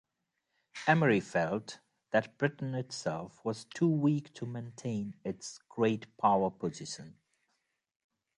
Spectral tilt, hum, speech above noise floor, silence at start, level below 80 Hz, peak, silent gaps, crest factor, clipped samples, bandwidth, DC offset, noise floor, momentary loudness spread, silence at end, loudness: -6 dB/octave; none; 52 dB; 0.75 s; -72 dBFS; -12 dBFS; none; 22 dB; under 0.1%; 11 kHz; under 0.1%; -84 dBFS; 15 LU; 1.25 s; -33 LUFS